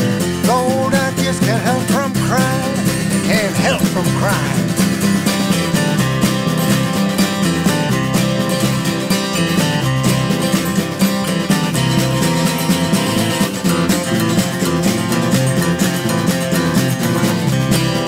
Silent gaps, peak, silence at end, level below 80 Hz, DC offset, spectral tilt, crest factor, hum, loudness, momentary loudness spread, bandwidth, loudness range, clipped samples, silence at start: none; -4 dBFS; 0 s; -42 dBFS; under 0.1%; -5 dB/octave; 12 dB; none; -16 LUFS; 2 LU; 16.5 kHz; 0 LU; under 0.1%; 0 s